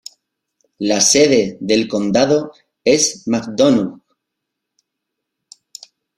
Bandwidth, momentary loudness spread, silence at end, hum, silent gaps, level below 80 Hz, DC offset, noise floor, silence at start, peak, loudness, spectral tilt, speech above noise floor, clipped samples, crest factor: 15 kHz; 11 LU; 2.25 s; none; none; -56 dBFS; under 0.1%; -79 dBFS; 0.8 s; 0 dBFS; -15 LUFS; -3 dB/octave; 64 dB; under 0.1%; 18 dB